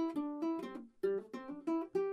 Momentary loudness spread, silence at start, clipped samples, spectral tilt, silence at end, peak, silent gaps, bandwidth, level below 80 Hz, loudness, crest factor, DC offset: 8 LU; 0 s; under 0.1%; -7 dB/octave; 0 s; -26 dBFS; none; 11 kHz; -80 dBFS; -40 LUFS; 14 dB; under 0.1%